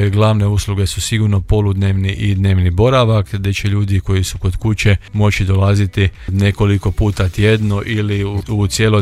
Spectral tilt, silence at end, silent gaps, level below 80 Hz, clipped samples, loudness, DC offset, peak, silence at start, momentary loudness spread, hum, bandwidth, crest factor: -6 dB/octave; 0 s; none; -28 dBFS; under 0.1%; -15 LUFS; under 0.1%; 0 dBFS; 0 s; 5 LU; none; 13.5 kHz; 14 dB